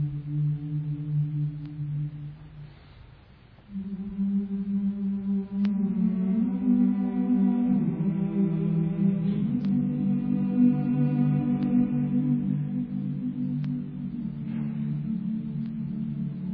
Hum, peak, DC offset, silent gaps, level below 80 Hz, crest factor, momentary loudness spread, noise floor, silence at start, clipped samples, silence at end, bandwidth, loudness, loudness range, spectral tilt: none; -10 dBFS; under 0.1%; none; -54 dBFS; 16 dB; 10 LU; -52 dBFS; 0 s; under 0.1%; 0 s; 4.3 kHz; -27 LUFS; 8 LU; -12.5 dB/octave